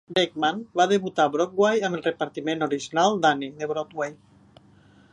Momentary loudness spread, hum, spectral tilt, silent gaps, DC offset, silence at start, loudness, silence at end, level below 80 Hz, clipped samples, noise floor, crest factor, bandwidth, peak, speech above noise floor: 8 LU; none; -4.5 dB/octave; none; under 0.1%; 0.1 s; -24 LUFS; 1 s; -70 dBFS; under 0.1%; -55 dBFS; 18 dB; 11 kHz; -6 dBFS; 31 dB